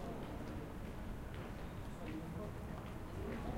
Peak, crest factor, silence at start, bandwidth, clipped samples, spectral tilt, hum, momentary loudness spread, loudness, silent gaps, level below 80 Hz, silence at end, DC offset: -30 dBFS; 16 dB; 0 s; 16 kHz; under 0.1%; -7 dB/octave; none; 3 LU; -48 LUFS; none; -52 dBFS; 0 s; under 0.1%